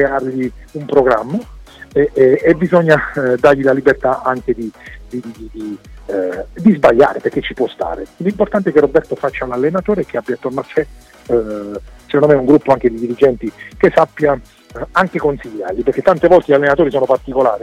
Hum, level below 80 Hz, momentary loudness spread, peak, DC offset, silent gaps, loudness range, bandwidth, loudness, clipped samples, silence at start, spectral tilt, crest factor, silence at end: none; -40 dBFS; 15 LU; 0 dBFS; under 0.1%; none; 4 LU; 12 kHz; -14 LUFS; under 0.1%; 0 s; -7.5 dB/octave; 14 dB; 0 s